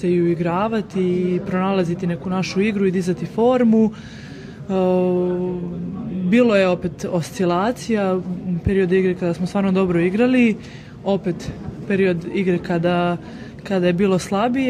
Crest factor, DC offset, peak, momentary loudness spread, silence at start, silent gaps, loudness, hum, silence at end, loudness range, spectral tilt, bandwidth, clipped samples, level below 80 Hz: 14 dB; under 0.1%; -4 dBFS; 12 LU; 0 s; none; -20 LUFS; none; 0 s; 2 LU; -7 dB/octave; 11 kHz; under 0.1%; -46 dBFS